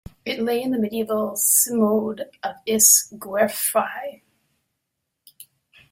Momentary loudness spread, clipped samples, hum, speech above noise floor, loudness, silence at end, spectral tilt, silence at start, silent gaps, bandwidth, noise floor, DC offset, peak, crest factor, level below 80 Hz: 17 LU; under 0.1%; none; 58 dB; -19 LUFS; 0.5 s; -2 dB/octave; 0.25 s; none; 16.5 kHz; -79 dBFS; under 0.1%; 0 dBFS; 22 dB; -62 dBFS